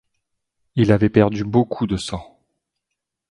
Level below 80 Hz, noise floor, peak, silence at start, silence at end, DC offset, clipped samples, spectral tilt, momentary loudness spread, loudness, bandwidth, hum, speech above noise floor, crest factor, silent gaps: -44 dBFS; -81 dBFS; 0 dBFS; 0.75 s; 1.05 s; under 0.1%; under 0.1%; -7.5 dB/octave; 13 LU; -19 LUFS; 11 kHz; none; 63 dB; 20 dB; none